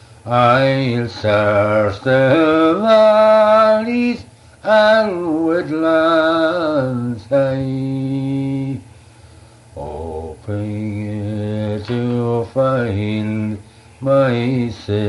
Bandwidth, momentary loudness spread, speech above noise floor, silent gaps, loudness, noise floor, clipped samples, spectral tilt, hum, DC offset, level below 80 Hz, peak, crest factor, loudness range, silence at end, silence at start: 11.5 kHz; 14 LU; 29 dB; none; -16 LUFS; -43 dBFS; under 0.1%; -7.5 dB/octave; none; under 0.1%; -48 dBFS; -2 dBFS; 14 dB; 12 LU; 0 s; 0.25 s